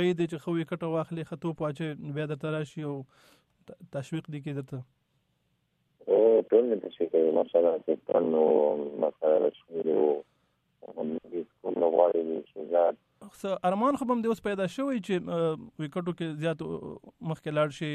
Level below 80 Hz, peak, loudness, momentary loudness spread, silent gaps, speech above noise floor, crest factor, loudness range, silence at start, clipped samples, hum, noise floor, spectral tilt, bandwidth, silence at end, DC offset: -70 dBFS; -8 dBFS; -29 LUFS; 13 LU; none; 46 dB; 20 dB; 10 LU; 0 s; under 0.1%; none; -74 dBFS; -7.5 dB/octave; 12 kHz; 0 s; under 0.1%